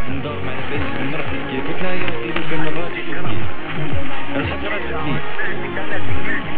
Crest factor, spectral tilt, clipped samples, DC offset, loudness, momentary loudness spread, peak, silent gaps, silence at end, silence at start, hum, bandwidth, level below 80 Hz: 12 dB; -9 dB/octave; under 0.1%; under 0.1%; -24 LUFS; 3 LU; 0 dBFS; none; 0 s; 0 s; none; 5 kHz; -38 dBFS